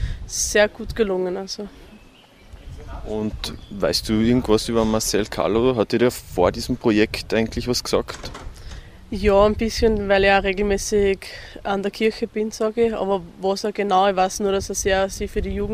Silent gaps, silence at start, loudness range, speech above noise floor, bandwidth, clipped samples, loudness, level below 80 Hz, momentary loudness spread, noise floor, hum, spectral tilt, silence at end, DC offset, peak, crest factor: none; 0 s; 5 LU; 28 dB; 15.5 kHz; under 0.1%; -21 LUFS; -36 dBFS; 14 LU; -48 dBFS; none; -4.5 dB/octave; 0 s; under 0.1%; -2 dBFS; 20 dB